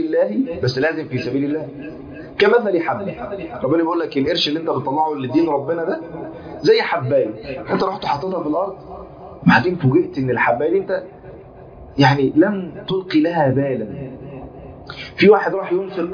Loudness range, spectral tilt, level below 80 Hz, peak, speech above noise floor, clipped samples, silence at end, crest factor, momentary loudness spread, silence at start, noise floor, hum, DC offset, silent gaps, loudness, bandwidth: 2 LU; -7 dB/octave; -50 dBFS; 0 dBFS; 21 dB; under 0.1%; 0 s; 18 dB; 18 LU; 0 s; -39 dBFS; none; under 0.1%; none; -18 LUFS; 5.4 kHz